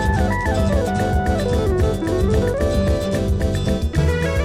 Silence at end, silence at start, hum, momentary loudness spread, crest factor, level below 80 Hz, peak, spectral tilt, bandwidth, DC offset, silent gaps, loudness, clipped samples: 0 s; 0 s; none; 2 LU; 12 dB; -24 dBFS; -6 dBFS; -7 dB/octave; 15 kHz; under 0.1%; none; -19 LUFS; under 0.1%